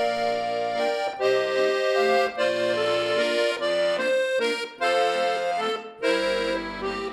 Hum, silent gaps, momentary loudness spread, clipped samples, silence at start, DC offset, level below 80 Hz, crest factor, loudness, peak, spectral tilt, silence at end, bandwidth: none; none; 5 LU; under 0.1%; 0 s; under 0.1%; -58 dBFS; 14 dB; -24 LUFS; -10 dBFS; -3 dB/octave; 0 s; 13.5 kHz